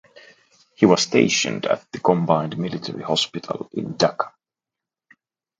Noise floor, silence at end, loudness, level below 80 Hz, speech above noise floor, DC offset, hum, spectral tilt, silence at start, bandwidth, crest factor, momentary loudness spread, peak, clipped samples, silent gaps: -88 dBFS; 1.3 s; -21 LUFS; -62 dBFS; 67 dB; under 0.1%; none; -4.5 dB/octave; 0.15 s; 9.4 kHz; 22 dB; 13 LU; 0 dBFS; under 0.1%; none